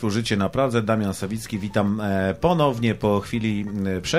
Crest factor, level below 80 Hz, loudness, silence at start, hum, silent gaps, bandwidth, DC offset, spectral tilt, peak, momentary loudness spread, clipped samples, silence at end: 16 dB; -48 dBFS; -23 LUFS; 0 s; none; none; 15 kHz; 0.3%; -6 dB/octave; -6 dBFS; 6 LU; under 0.1%; 0 s